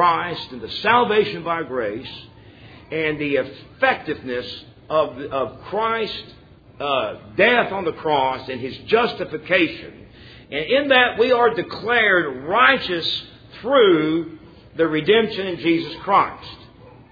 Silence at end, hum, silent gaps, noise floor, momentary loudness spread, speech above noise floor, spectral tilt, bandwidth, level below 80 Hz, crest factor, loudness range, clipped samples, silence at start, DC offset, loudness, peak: 0.25 s; none; none; -45 dBFS; 14 LU; 25 dB; -6.5 dB/octave; 5 kHz; -54 dBFS; 20 dB; 6 LU; under 0.1%; 0 s; under 0.1%; -20 LUFS; 0 dBFS